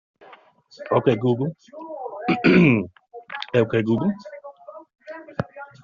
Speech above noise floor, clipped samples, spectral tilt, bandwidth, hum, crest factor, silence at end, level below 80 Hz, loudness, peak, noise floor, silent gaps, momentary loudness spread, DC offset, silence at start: 30 dB; under 0.1%; -6 dB/octave; 7.2 kHz; none; 20 dB; 0.2 s; -58 dBFS; -21 LUFS; -4 dBFS; -50 dBFS; none; 24 LU; under 0.1%; 0.8 s